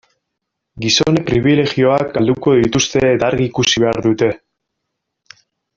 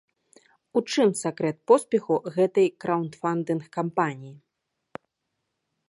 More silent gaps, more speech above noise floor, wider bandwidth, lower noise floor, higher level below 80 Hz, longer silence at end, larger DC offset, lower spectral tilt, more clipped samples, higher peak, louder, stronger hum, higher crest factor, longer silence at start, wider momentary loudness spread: neither; first, 62 dB vs 56 dB; second, 7.6 kHz vs 11.5 kHz; second, -76 dBFS vs -80 dBFS; first, -44 dBFS vs -76 dBFS; about the same, 1.4 s vs 1.5 s; neither; about the same, -4.5 dB/octave vs -5.5 dB/octave; neither; first, 0 dBFS vs -6 dBFS; first, -14 LUFS vs -25 LUFS; neither; second, 14 dB vs 22 dB; about the same, 0.75 s vs 0.75 s; second, 4 LU vs 19 LU